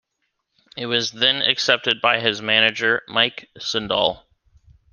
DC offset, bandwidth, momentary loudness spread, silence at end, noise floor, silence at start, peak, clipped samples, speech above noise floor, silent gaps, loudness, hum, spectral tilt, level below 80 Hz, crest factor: under 0.1%; 10 kHz; 10 LU; 0.75 s; -75 dBFS; 0.75 s; -2 dBFS; under 0.1%; 54 dB; none; -19 LUFS; none; -2.5 dB/octave; -58 dBFS; 22 dB